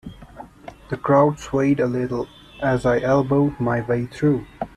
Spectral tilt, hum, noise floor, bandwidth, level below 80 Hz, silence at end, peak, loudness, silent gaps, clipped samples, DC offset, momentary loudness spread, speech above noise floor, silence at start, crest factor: -8 dB/octave; none; -42 dBFS; 11 kHz; -46 dBFS; 0.1 s; -4 dBFS; -21 LUFS; none; under 0.1%; under 0.1%; 17 LU; 22 dB; 0.05 s; 16 dB